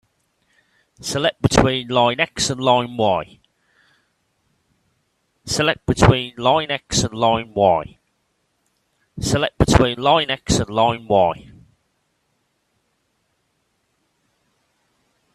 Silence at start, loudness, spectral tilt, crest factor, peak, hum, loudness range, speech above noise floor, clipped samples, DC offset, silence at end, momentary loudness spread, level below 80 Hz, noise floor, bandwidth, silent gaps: 1 s; -18 LUFS; -4.5 dB/octave; 22 dB; 0 dBFS; none; 5 LU; 51 dB; under 0.1%; under 0.1%; 3.95 s; 9 LU; -38 dBFS; -69 dBFS; 14.5 kHz; none